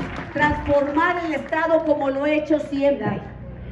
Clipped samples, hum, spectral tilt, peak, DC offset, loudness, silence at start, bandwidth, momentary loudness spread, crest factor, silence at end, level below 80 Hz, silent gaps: under 0.1%; none; -7 dB/octave; -6 dBFS; under 0.1%; -21 LUFS; 0 s; 8.2 kHz; 9 LU; 16 dB; 0 s; -42 dBFS; none